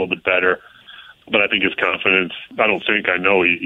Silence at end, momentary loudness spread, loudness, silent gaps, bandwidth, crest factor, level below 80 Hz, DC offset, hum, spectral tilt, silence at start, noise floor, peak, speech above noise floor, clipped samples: 0 s; 5 LU; -17 LUFS; none; 4.1 kHz; 16 dB; -58 dBFS; under 0.1%; none; -6 dB/octave; 0 s; -43 dBFS; -2 dBFS; 24 dB; under 0.1%